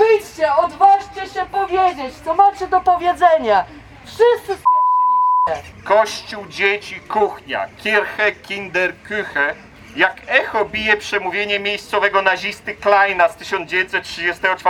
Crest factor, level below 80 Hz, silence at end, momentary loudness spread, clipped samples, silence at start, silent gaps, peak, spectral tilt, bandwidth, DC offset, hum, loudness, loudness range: 16 dB; -50 dBFS; 0 s; 10 LU; under 0.1%; 0 s; none; 0 dBFS; -3.5 dB/octave; 16 kHz; under 0.1%; none; -17 LUFS; 3 LU